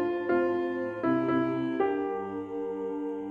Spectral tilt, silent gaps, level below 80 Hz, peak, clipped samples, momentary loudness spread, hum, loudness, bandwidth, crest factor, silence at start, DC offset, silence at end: -8.5 dB/octave; none; -66 dBFS; -16 dBFS; under 0.1%; 8 LU; none; -30 LUFS; 5 kHz; 14 dB; 0 s; under 0.1%; 0 s